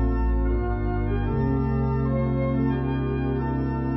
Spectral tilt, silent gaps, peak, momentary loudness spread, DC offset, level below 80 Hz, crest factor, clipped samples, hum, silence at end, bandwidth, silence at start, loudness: -11.5 dB/octave; none; -14 dBFS; 2 LU; under 0.1%; -28 dBFS; 10 dB; under 0.1%; none; 0 s; 5.8 kHz; 0 s; -25 LUFS